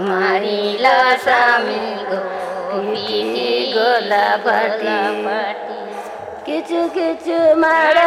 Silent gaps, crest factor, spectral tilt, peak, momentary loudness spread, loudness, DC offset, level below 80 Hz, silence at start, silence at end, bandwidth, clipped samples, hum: none; 16 dB; -4 dB/octave; -2 dBFS; 12 LU; -17 LUFS; under 0.1%; -62 dBFS; 0 s; 0 s; 15 kHz; under 0.1%; none